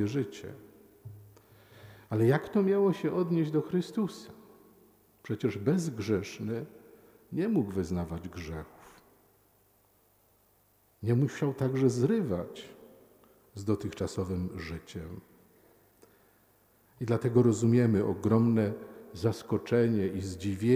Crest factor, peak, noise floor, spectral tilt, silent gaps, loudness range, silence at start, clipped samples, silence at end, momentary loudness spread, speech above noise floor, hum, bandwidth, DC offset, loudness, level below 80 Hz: 20 dB; -12 dBFS; -67 dBFS; -7.5 dB/octave; none; 10 LU; 0 s; under 0.1%; 0 s; 21 LU; 38 dB; none; 16 kHz; under 0.1%; -30 LUFS; -60 dBFS